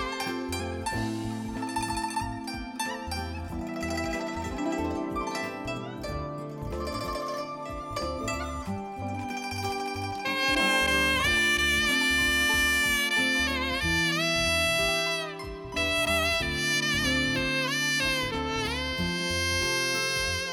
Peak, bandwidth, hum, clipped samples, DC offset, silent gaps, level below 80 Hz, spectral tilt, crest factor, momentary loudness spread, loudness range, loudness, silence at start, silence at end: -12 dBFS; 17.5 kHz; none; under 0.1%; under 0.1%; none; -44 dBFS; -3 dB/octave; 16 dB; 12 LU; 10 LU; -27 LUFS; 0 s; 0 s